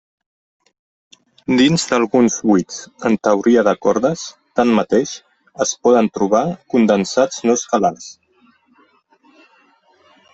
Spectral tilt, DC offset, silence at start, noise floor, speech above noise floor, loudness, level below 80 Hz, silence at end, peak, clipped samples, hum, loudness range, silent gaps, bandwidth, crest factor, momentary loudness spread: -4.5 dB/octave; under 0.1%; 1.5 s; -56 dBFS; 40 dB; -16 LUFS; -58 dBFS; 2.2 s; -2 dBFS; under 0.1%; none; 4 LU; none; 8.4 kHz; 16 dB; 10 LU